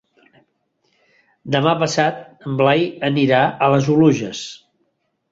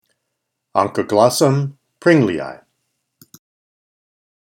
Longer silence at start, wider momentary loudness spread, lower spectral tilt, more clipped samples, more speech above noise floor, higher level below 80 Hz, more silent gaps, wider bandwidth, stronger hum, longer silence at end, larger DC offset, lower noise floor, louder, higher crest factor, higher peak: first, 1.45 s vs 0.75 s; about the same, 13 LU vs 13 LU; about the same, -6 dB/octave vs -5.5 dB/octave; neither; second, 52 dB vs 61 dB; first, -58 dBFS vs -64 dBFS; neither; second, 8 kHz vs 18.5 kHz; neither; second, 0.75 s vs 1.95 s; neither; second, -69 dBFS vs -76 dBFS; about the same, -17 LUFS vs -17 LUFS; about the same, 18 dB vs 20 dB; about the same, -2 dBFS vs 0 dBFS